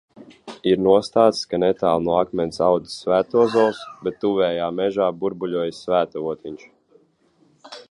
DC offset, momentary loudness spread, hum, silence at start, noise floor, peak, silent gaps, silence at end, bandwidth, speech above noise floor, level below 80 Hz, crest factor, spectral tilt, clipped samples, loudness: under 0.1%; 12 LU; none; 0.2 s; -60 dBFS; -2 dBFS; none; 0.1 s; 11 kHz; 40 dB; -56 dBFS; 20 dB; -6 dB/octave; under 0.1%; -21 LUFS